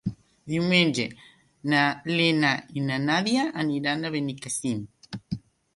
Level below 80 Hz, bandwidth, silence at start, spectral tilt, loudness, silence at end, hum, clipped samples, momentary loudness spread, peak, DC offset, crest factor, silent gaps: -60 dBFS; 11.5 kHz; 0.05 s; -4.5 dB/octave; -25 LUFS; 0.35 s; none; under 0.1%; 15 LU; -6 dBFS; under 0.1%; 20 dB; none